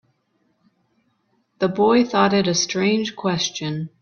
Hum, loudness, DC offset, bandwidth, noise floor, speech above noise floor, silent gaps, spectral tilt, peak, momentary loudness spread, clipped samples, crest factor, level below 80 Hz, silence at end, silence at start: none; -20 LUFS; under 0.1%; 7 kHz; -67 dBFS; 48 dB; none; -4.5 dB/octave; -4 dBFS; 8 LU; under 0.1%; 18 dB; -60 dBFS; 0.15 s; 1.6 s